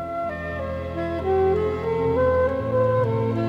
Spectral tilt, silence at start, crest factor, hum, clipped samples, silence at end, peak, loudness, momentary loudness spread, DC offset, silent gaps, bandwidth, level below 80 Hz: -9 dB/octave; 0 s; 12 dB; none; under 0.1%; 0 s; -10 dBFS; -23 LUFS; 8 LU; under 0.1%; none; 7.2 kHz; -46 dBFS